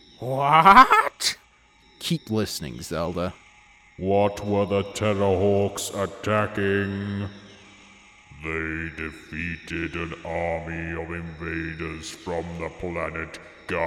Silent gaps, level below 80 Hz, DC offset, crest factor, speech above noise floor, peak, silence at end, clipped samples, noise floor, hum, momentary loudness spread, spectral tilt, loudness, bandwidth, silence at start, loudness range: none; -50 dBFS; under 0.1%; 24 dB; 33 dB; -2 dBFS; 0 s; under 0.1%; -57 dBFS; none; 14 LU; -5 dB/octave; -24 LUFS; 18 kHz; 0.2 s; 11 LU